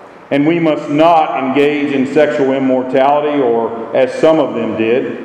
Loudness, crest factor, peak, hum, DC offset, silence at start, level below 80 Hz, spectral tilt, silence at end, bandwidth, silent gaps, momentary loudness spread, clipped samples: -13 LUFS; 12 dB; 0 dBFS; none; under 0.1%; 0 s; -58 dBFS; -7 dB/octave; 0 s; 9.6 kHz; none; 5 LU; under 0.1%